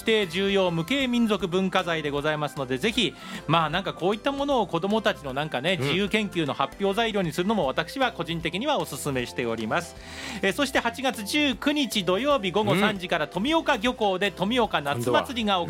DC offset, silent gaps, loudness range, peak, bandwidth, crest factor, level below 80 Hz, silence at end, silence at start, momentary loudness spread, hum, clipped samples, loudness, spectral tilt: under 0.1%; none; 3 LU; -6 dBFS; 16.5 kHz; 20 dB; -52 dBFS; 0 s; 0 s; 5 LU; none; under 0.1%; -25 LUFS; -4.5 dB/octave